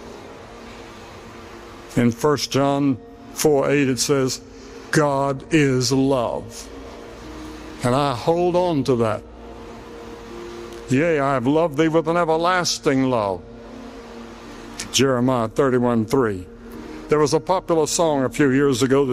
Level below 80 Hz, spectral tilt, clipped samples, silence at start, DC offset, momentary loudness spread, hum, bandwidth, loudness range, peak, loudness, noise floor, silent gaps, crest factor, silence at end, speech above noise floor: -46 dBFS; -5 dB/octave; under 0.1%; 0 s; under 0.1%; 20 LU; none; 15.5 kHz; 3 LU; -6 dBFS; -20 LUFS; -39 dBFS; none; 16 dB; 0 s; 20 dB